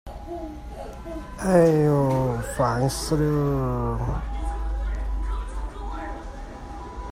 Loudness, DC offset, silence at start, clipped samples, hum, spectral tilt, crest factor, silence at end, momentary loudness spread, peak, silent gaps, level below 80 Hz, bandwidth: -25 LUFS; under 0.1%; 0.05 s; under 0.1%; none; -7 dB/octave; 20 dB; 0 s; 18 LU; -6 dBFS; none; -32 dBFS; 16 kHz